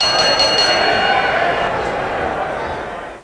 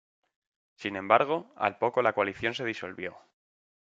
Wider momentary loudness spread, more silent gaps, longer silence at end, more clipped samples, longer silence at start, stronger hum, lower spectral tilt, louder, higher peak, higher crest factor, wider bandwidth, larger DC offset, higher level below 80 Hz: second, 11 LU vs 14 LU; neither; second, 0 s vs 0.65 s; neither; second, 0 s vs 0.8 s; neither; second, -2 dB/octave vs -5.5 dB/octave; first, -15 LUFS vs -29 LUFS; about the same, -2 dBFS vs -4 dBFS; second, 14 dB vs 26 dB; first, 10.5 kHz vs 7.8 kHz; neither; first, -40 dBFS vs -70 dBFS